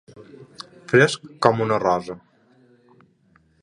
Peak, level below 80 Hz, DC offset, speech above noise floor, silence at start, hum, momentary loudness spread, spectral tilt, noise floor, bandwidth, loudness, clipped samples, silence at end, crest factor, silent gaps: 0 dBFS; -60 dBFS; under 0.1%; 39 dB; 0.15 s; none; 23 LU; -5.5 dB/octave; -60 dBFS; 11 kHz; -20 LUFS; under 0.1%; 1.45 s; 24 dB; none